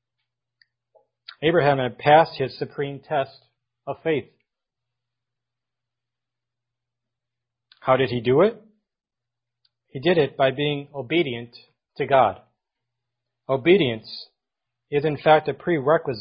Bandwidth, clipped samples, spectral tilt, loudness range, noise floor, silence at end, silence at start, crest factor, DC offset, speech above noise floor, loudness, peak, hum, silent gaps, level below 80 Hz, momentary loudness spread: 5.4 kHz; under 0.1%; -10.5 dB/octave; 9 LU; -87 dBFS; 0 s; 1.4 s; 22 dB; under 0.1%; 66 dB; -22 LUFS; -2 dBFS; none; none; -60 dBFS; 16 LU